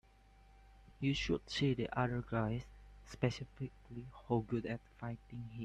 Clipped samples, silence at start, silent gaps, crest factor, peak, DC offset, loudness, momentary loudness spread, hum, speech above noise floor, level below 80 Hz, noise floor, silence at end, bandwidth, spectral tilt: under 0.1%; 0.5 s; none; 22 dB; -20 dBFS; under 0.1%; -39 LUFS; 15 LU; none; 25 dB; -58 dBFS; -64 dBFS; 0 s; 9.8 kHz; -6.5 dB/octave